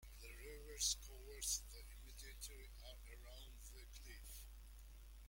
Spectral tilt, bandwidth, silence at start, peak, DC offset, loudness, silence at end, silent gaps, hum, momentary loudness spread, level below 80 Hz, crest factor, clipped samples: -0.5 dB/octave; 16.5 kHz; 0 s; -26 dBFS; under 0.1%; -49 LUFS; 0 s; none; none; 18 LU; -58 dBFS; 26 dB; under 0.1%